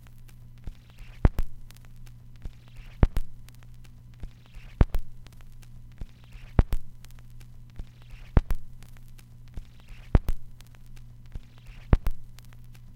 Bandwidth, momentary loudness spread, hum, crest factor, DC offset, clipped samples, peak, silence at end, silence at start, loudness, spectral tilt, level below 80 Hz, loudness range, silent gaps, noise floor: 16 kHz; 23 LU; 60 Hz at -55 dBFS; 28 dB; under 0.1%; under 0.1%; -2 dBFS; 0.05 s; 0.15 s; -30 LUFS; -8 dB/octave; -32 dBFS; 3 LU; none; -46 dBFS